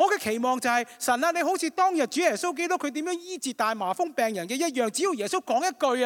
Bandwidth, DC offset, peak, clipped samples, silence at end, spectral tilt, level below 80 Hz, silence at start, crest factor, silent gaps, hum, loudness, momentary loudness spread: 17.5 kHz; under 0.1%; -8 dBFS; under 0.1%; 0 s; -2.5 dB/octave; -78 dBFS; 0 s; 18 dB; none; none; -26 LUFS; 4 LU